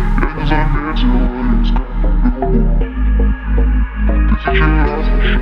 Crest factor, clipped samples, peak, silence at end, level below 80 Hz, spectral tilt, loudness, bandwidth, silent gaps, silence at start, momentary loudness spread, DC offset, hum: 12 dB; under 0.1%; 0 dBFS; 0 s; -14 dBFS; -9 dB/octave; -16 LUFS; 5.2 kHz; none; 0 s; 4 LU; under 0.1%; none